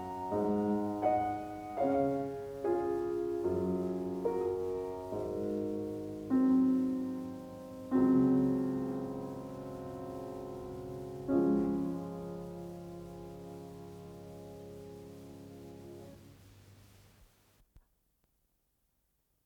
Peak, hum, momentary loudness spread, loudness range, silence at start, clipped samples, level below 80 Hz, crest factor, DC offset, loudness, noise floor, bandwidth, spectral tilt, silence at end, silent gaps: -16 dBFS; none; 20 LU; 19 LU; 0 s; under 0.1%; -62 dBFS; 18 dB; under 0.1%; -34 LUFS; -78 dBFS; 16 kHz; -8.5 dB/octave; 1.65 s; none